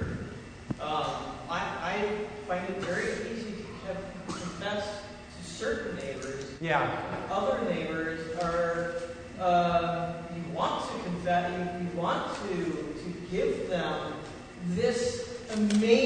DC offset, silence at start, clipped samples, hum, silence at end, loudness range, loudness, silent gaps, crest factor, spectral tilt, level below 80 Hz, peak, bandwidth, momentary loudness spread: under 0.1%; 0 s; under 0.1%; none; 0 s; 5 LU; -32 LUFS; none; 22 dB; -5.5 dB/octave; -54 dBFS; -10 dBFS; 9.6 kHz; 11 LU